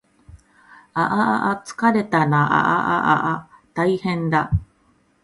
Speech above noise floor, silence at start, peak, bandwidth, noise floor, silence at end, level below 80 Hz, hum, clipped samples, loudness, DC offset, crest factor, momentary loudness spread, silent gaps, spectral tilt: 41 dB; 0.35 s; -2 dBFS; 11.5 kHz; -60 dBFS; 0.6 s; -42 dBFS; none; under 0.1%; -20 LUFS; under 0.1%; 18 dB; 8 LU; none; -7 dB/octave